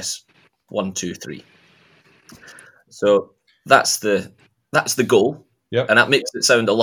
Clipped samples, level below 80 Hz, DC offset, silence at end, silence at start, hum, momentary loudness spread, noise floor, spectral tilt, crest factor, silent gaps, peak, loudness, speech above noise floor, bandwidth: under 0.1%; -68 dBFS; under 0.1%; 0 s; 0 s; none; 18 LU; -58 dBFS; -3 dB/octave; 20 dB; none; 0 dBFS; -18 LUFS; 40 dB; 18 kHz